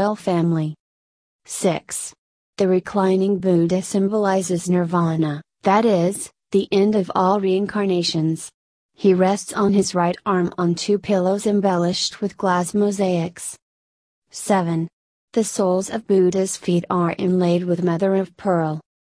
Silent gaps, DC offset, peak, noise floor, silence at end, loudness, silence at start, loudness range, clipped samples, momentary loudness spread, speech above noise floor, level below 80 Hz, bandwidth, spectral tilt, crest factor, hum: 0.80-1.39 s, 2.18-2.53 s, 8.54-8.89 s, 13.62-14.22 s, 14.93-15.28 s; under 0.1%; -4 dBFS; under -90 dBFS; 0.2 s; -20 LUFS; 0 s; 3 LU; under 0.1%; 7 LU; over 71 dB; -60 dBFS; 11 kHz; -5.5 dB/octave; 16 dB; none